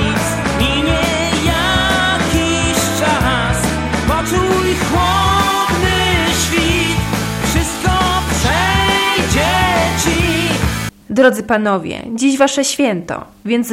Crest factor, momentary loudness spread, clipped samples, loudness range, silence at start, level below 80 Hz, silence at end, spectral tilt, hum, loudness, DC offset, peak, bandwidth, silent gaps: 14 dB; 5 LU; under 0.1%; 1 LU; 0 s; -26 dBFS; 0 s; -4 dB/octave; none; -14 LUFS; under 0.1%; 0 dBFS; 16.5 kHz; none